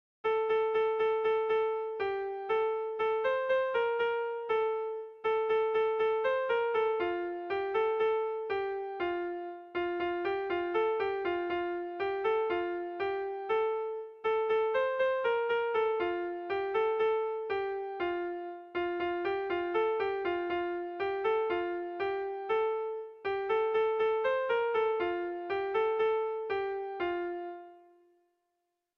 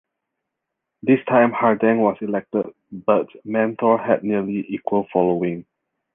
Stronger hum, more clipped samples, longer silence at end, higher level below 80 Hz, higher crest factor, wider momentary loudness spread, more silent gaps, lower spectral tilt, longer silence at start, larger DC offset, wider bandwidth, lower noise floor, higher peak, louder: neither; neither; first, 1.2 s vs 0.55 s; second, -68 dBFS vs -62 dBFS; second, 12 dB vs 18 dB; about the same, 7 LU vs 9 LU; neither; second, -6 dB/octave vs -10.5 dB/octave; second, 0.25 s vs 1.05 s; neither; first, 5.4 kHz vs 3.7 kHz; about the same, -83 dBFS vs -81 dBFS; second, -20 dBFS vs -2 dBFS; second, -32 LUFS vs -20 LUFS